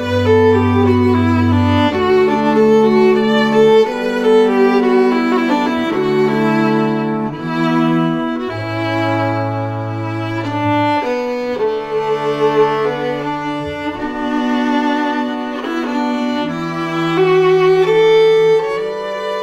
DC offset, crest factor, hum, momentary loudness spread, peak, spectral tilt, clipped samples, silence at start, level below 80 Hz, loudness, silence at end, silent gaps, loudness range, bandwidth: under 0.1%; 12 dB; none; 10 LU; -2 dBFS; -7 dB/octave; under 0.1%; 0 s; -50 dBFS; -15 LUFS; 0 s; none; 6 LU; 12 kHz